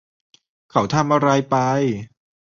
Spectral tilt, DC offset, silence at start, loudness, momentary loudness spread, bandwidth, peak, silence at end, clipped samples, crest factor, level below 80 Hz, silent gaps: -6 dB/octave; under 0.1%; 0.75 s; -19 LUFS; 7 LU; 7.2 kHz; -2 dBFS; 0.45 s; under 0.1%; 18 dB; -56 dBFS; none